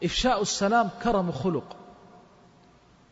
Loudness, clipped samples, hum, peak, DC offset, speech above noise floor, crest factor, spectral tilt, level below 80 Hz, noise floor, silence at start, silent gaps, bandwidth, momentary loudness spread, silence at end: -26 LUFS; under 0.1%; none; -12 dBFS; under 0.1%; 32 dB; 16 dB; -4.5 dB/octave; -46 dBFS; -57 dBFS; 0 s; none; 8 kHz; 14 LU; 1.2 s